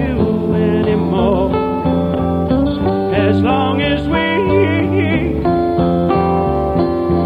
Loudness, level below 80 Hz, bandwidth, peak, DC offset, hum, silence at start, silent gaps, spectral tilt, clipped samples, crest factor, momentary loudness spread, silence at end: -15 LUFS; -30 dBFS; 5 kHz; 0 dBFS; under 0.1%; none; 0 s; none; -9 dB/octave; under 0.1%; 14 dB; 3 LU; 0 s